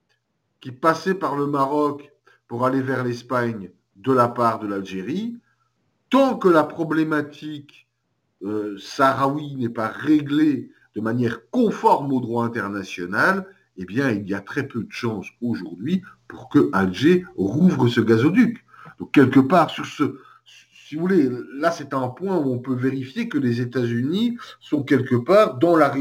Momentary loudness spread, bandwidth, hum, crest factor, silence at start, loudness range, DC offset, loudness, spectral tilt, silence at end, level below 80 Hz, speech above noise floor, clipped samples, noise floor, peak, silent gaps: 13 LU; 16.5 kHz; none; 20 dB; 0.65 s; 5 LU; under 0.1%; -21 LUFS; -7 dB/octave; 0 s; -64 dBFS; 52 dB; under 0.1%; -72 dBFS; -2 dBFS; none